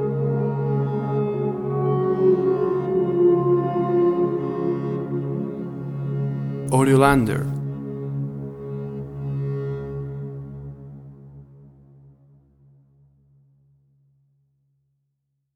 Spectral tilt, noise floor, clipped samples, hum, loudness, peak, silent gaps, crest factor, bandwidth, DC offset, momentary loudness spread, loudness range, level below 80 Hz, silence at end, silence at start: -8 dB/octave; -75 dBFS; under 0.1%; none; -23 LUFS; -2 dBFS; none; 22 dB; 13 kHz; under 0.1%; 15 LU; 13 LU; -50 dBFS; 3.85 s; 0 s